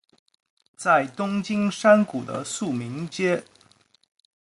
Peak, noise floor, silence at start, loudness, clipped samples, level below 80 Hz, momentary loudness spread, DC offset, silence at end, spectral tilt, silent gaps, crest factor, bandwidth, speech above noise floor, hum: -4 dBFS; -59 dBFS; 0.8 s; -23 LUFS; under 0.1%; -68 dBFS; 12 LU; under 0.1%; 1 s; -5 dB/octave; none; 20 dB; 11.5 kHz; 37 dB; none